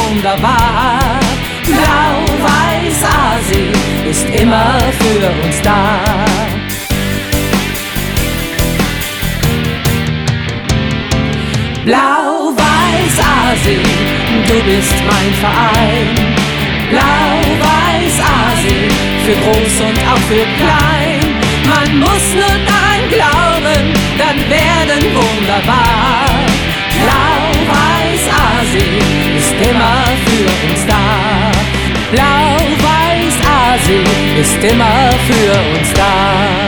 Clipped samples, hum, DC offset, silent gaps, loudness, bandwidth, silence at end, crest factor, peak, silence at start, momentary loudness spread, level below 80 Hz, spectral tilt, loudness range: under 0.1%; none; 0.1%; none; -11 LUFS; over 20 kHz; 0 s; 10 dB; 0 dBFS; 0 s; 5 LU; -22 dBFS; -4.5 dB/octave; 4 LU